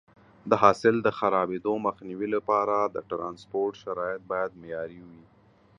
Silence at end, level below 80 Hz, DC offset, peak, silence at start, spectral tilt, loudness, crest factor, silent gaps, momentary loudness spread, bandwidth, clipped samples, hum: 0.6 s; -64 dBFS; under 0.1%; -4 dBFS; 0.45 s; -6.5 dB/octave; -27 LUFS; 24 dB; none; 14 LU; 10.5 kHz; under 0.1%; none